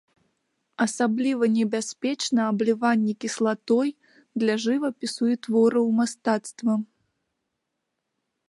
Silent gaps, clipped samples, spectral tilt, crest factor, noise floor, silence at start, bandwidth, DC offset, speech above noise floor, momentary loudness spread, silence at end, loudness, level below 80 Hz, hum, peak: none; under 0.1%; -4.5 dB/octave; 18 dB; -80 dBFS; 0.8 s; 11.5 kHz; under 0.1%; 57 dB; 6 LU; 1.65 s; -24 LUFS; -78 dBFS; none; -8 dBFS